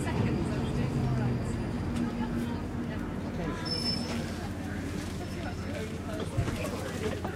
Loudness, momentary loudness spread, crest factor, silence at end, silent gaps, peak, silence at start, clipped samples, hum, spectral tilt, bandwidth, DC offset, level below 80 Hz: -33 LUFS; 6 LU; 14 dB; 0 s; none; -18 dBFS; 0 s; under 0.1%; none; -6 dB/octave; 16 kHz; under 0.1%; -44 dBFS